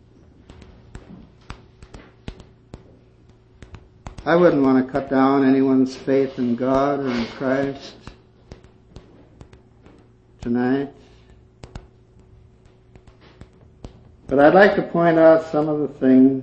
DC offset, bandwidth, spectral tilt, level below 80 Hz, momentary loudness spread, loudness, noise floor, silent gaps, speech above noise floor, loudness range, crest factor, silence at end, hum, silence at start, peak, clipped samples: under 0.1%; 7.4 kHz; -7.5 dB/octave; -48 dBFS; 20 LU; -18 LUFS; -51 dBFS; none; 34 dB; 12 LU; 20 dB; 0 s; none; 0.95 s; -2 dBFS; under 0.1%